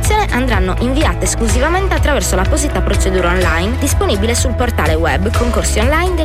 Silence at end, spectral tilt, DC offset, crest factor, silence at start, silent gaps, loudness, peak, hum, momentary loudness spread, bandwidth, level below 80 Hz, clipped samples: 0 s; -4.5 dB/octave; under 0.1%; 10 dB; 0 s; none; -14 LUFS; -4 dBFS; none; 2 LU; 15.5 kHz; -18 dBFS; under 0.1%